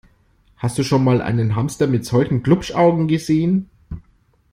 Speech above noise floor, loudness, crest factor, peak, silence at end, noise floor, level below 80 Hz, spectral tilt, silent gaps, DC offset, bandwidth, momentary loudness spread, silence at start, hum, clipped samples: 40 dB; -18 LUFS; 16 dB; -2 dBFS; 0.55 s; -57 dBFS; -44 dBFS; -7 dB/octave; none; under 0.1%; 15 kHz; 14 LU; 0.6 s; none; under 0.1%